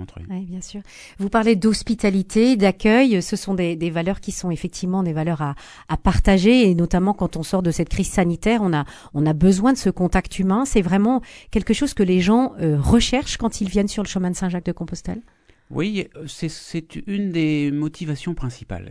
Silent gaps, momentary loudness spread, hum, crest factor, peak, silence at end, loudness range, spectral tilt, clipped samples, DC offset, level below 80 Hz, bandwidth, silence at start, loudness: none; 14 LU; none; 18 dB; -2 dBFS; 0 s; 7 LU; -6 dB/octave; under 0.1%; under 0.1%; -34 dBFS; 11 kHz; 0 s; -20 LUFS